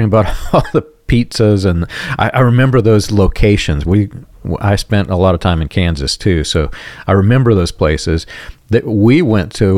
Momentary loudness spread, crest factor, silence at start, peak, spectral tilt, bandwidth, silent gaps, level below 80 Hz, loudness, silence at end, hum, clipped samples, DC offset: 8 LU; 12 dB; 0 s; 0 dBFS; -6.5 dB/octave; 14 kHz; none; -26 dBFS; -13 LUFS; 0 s; none; under 0.1%; under 0.1%